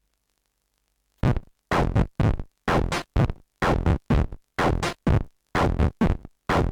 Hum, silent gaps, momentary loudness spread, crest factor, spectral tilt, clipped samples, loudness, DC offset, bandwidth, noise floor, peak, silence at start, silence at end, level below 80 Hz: none; none; 4 LU; 12 dB; -7 dB/octave; under 0.1%; -25 LUFS; under 0.1%; 14.5 kHz; -74 dBFS; -12 dBFS; 1.25 s; 0 s; -30 dBFS